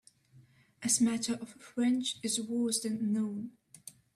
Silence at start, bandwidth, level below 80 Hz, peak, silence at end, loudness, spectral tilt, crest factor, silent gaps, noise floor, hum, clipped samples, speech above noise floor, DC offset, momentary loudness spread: 0.35 s; 14.5 kHz; -76 dBFS; -16 dBFS; 0.25 s; -32 LUFS; -3 dB/octave; 18 dB; none; -62 dBFS; none; under 0.1%; 30 dB; under 0.1%; 18 LU